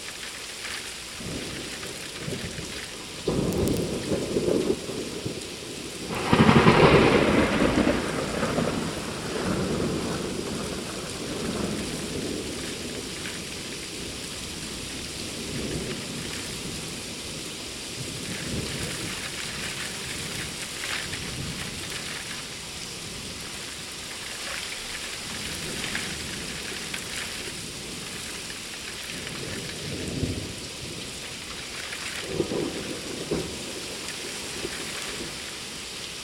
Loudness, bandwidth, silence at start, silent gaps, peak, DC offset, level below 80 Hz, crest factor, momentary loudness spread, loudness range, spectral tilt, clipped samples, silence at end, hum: -29 LUFS; 16.5 kHz; 0 s; none; -2 dBFS; under 0.1%; -46 dBFS; 26 dB; 9 LU; 11 LU; -4 dB/octave; under 0.1%; 0 s; none